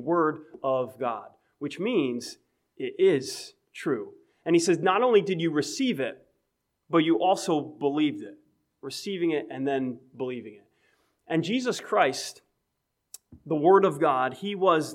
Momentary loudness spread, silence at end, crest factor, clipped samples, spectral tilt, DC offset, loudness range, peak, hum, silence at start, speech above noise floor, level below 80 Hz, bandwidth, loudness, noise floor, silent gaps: 16 LU; 0 s; 20 dB; under 0.1%; -5 dB/octave; under 0.1%; 5 LU; -8 dBFS; none; 0 s; 54 dB; -78 dBFS; 15.5 kHz; -26 LUFS; -80 dBFS; none